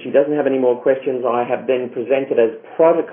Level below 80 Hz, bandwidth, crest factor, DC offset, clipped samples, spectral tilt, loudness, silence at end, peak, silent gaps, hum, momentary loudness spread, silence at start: -76 dBFS; 3.6 kHz; 14 dB; under 0.1%; under 0.1%; -10.5 dB/octave; -18 LUFS; 0 s; -2 dBFS; none; none; 4 LU; 0 s